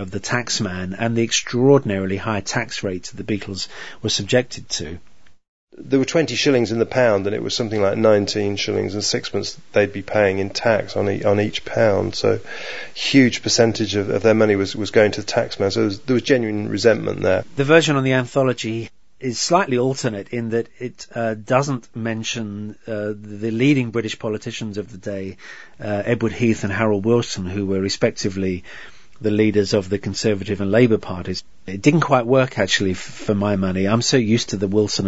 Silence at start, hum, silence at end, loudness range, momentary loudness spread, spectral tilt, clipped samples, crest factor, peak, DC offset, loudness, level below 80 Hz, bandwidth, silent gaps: 0 s; none; 0 s; 5 LU; 12 LU; -5 dB/octave; under 0.1%; 20 dB; 0 dBFS; 1%; -20 LUFS; -52 dBFS; 8 kHz; 5.48-5.67 s